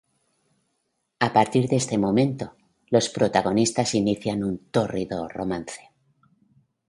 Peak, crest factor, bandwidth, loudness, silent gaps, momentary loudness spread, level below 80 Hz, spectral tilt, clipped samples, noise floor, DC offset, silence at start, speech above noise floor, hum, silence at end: -4 dBFS; 22 dB; 11.5 kHz; -24 LUFS; none; 10 LU; -56 dBFS; -5 dB/octave; under 0.1%; -75 dBFS; under 0.1%; 1.2 s; 52 dB; none; 1.15 s